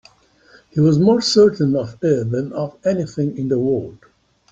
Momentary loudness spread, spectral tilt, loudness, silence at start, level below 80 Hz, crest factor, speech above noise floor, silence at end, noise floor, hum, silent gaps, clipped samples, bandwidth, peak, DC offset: 10 LU; -6.5 dB/octave; -18 LUFS; 0.75 s; -54 dBFS; 16 dB; 34 dB; 0.55 s; -51 dBFS; none; none; under 0.1%; 8.8 kHz; -2 dBFS; under 0.1%